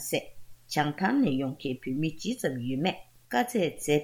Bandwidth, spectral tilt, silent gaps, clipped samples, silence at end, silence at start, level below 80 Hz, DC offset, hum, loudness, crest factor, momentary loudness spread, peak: 18 kHz; -5 dB/octave; none; under 0.1%; 0 s; 0 s; -60 dBFS; under 0.1%; none; -30 LUFS; 18 dB; 7 LU; -12 dBFS